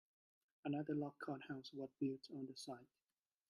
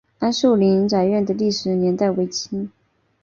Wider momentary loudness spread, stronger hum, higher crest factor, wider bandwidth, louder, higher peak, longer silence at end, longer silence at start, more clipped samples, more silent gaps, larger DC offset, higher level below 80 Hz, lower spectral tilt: about the same, 9 LU vs 10 LU; neither; about the same, 18 dB vs 14 dB; first, 12 kHz vs 7.4 kHz; second, -48 LUFS vs -19 LUFS; second, -32 dBFS vs -4 dBFS; about the same, 0.65 s vs 0.55 s; first, 0.65 s vs 0.2 s; neither; neither; neither; second, -88 dBFS vs -58 dBFS; about the same, -6.5 dB/octave vs -6 dB/octave